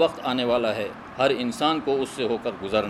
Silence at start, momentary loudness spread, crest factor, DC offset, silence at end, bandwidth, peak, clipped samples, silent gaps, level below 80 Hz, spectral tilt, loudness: 0 s; 5 LU; 16 dB; under 0.1%; 0 s; 14.5 kHz; -8 dBFS; under 0.1%; none; -56 dBFS; -4.5 dB/octave; -25 LUFS